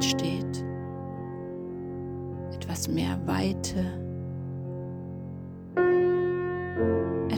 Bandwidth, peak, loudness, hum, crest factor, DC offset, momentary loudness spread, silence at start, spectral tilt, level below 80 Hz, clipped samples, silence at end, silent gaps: 19 kHz; -14 dBFS; -30 LUFS; none; 16 dB; under 0.1%; 12 LU; 0 s; -5.5 dB/octave; -52 dBFS; under 0.1%; 0 s; none